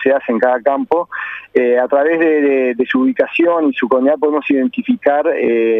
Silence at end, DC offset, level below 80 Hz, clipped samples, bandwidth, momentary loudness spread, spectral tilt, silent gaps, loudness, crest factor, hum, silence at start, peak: 0 s; under 0.1%; -62 dBFS; under 0.1%; 4 kHz; 4 LU; -7.5 dB/octave; none; -14 LUFS; 14 dB; none; 0 s; 0 dBFS